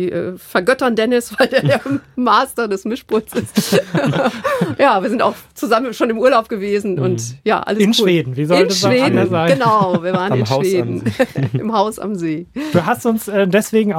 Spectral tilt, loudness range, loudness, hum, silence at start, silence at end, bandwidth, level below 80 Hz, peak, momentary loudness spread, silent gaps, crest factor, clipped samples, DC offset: -5.5 dB/octave; 3 LU; -16 LUFS; none; 0 s; 0 s; 17 kHz; -54 dBFS; 0 dBFS; 7 LU; none; 14 dB; under 0.1%; under 0.1%